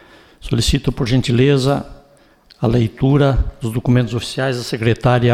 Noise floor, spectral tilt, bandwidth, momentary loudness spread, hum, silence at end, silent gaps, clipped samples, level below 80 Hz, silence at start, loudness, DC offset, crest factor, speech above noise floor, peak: -50 dBFS; -6.5 dB/octave; 14.5 kHz; 8 LU; none; 0 s; none; under 0.1%; -30 dBFS; 0.45 s; -17 LUFS; under 0.1%; 14 dB; 35 dB; -4 dBFS